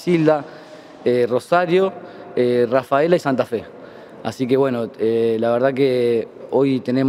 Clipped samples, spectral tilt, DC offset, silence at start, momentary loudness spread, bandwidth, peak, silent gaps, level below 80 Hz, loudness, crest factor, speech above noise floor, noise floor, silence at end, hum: under 0.1%; -7 dB/octave; under 0.1%; 0 s; 13 LU; 15 kHz; -2 dBFS; none; -64 dBFS; -19 LUFS; 16 dB; 21 dB; -39 dBFS; 0 s; none